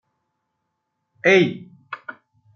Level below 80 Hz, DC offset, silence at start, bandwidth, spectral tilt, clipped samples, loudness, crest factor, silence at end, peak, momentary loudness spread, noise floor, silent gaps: -72 dBFS; under 0.1%; 1.25 s; 6.8 kHz; -5.5 dB/octave; under 0.1%; -18 LUFS; 20 dB; 0.45 s; -4 dBFS; 22 LU; -77 dBFS; none